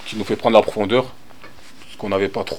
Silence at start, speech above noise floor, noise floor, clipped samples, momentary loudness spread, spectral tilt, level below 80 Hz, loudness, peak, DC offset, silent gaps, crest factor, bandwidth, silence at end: 0 s; 25 dB; -44 dBFS; under 0.1%; 13 LU; -5.5 dB/octave; -54 dBFS; -18 LUFS; 0 dBFS; 2%; none; 20 dB; 17 kHz; 0 s